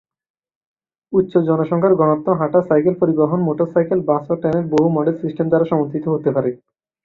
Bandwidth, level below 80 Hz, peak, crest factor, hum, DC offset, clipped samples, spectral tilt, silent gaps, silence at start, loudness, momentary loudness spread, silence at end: 7 kHz; -58 dBFS; -2 dBFS; 16 dB; none; under 0.1%; under 0.1%; -10 dB/octave; none; 1.1 s; -17 LUFS; 5 LU; 0.5 s